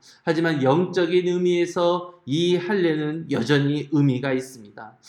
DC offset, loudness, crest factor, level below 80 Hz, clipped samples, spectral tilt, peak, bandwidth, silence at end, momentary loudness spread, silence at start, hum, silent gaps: under 0.1%; -22 LUFS; 16 dB; -70 dBFS; under 0.1%; -6.5 dB/octave; -6 dBFS; 12 kHz; 0.2 s; 7 LU; 0.25 s; none; none